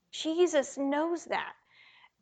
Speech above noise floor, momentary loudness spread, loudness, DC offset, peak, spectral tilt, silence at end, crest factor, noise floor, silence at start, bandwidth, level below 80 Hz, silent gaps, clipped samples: 30 dB; 8 LU; -30 LUFS; under 0.1%; -14 dBFS; -2.5 dB/octave; 0.7 s; 18 dB; -60 dBFS; 0.15 s; 9.2 kHz; -80 dBFS; none; under 0.1%